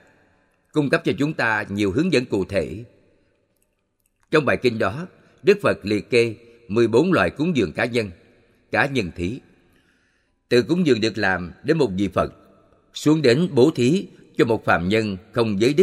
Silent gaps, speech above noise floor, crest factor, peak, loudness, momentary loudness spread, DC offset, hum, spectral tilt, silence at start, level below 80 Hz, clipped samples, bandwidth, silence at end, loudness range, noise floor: none; 50 dB; 20 dB; -2 dBFS; -21 LUFS; 10 LU; under 0.1%; none; -6 dB/octave; 0.75 s; -52 dBFS; under 0.1%; 13 kHz; 0 s; 4 LU; -69 dBFS